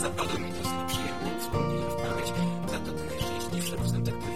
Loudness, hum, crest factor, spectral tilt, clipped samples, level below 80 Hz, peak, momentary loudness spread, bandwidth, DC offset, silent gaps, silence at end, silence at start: -31 LUFS; none; 14 dB; -5 dB/octave; under 0.1%; -46 dBFS; -16 dBFS; 3 LU; 16.5 kHz; 1%; none; 0 s; 0 s